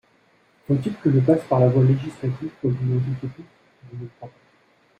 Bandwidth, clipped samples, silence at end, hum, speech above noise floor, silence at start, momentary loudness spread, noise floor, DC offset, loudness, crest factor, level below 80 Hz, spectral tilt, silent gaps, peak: 4.9 kHz; under 0.1%; 0.7 s; none; 39 dB; 0.7 s; 20 LU; -60 dBFS; under 0.1%; -21 LUFS; 18 dB; -58 dBFS; -10 dB/octave; none; -4 dBFS